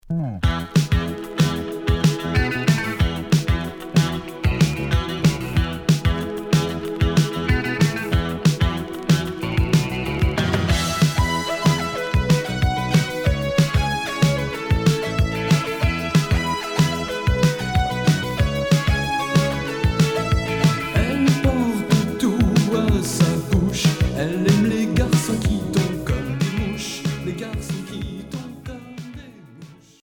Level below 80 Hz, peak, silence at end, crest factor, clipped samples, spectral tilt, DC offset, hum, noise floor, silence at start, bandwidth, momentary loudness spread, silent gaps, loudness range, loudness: -30 dBFS; -4 dBFS; 0.3 s; 16 dB; under 0.1%; -5.5 dB/octave; under 0.1%; none; -43 dBFS; 0.05 s; 19 kHz; 7 LU; none; 2 LU; -21 LUFS